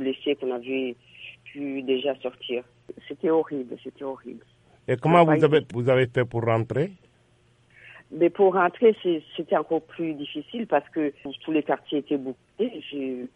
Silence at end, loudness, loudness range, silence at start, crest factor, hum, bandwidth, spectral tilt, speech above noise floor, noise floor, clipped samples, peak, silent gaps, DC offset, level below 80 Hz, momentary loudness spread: 0.1 s; -25 LUFS; 7 LU; 0 s; 20 dB; none; 9 kHz; -8 dB/octave; 36 dB; -61 dBFS; under 0.1%; -4 dBFS; none; under 0.1%; -66 dBFS; 17 LU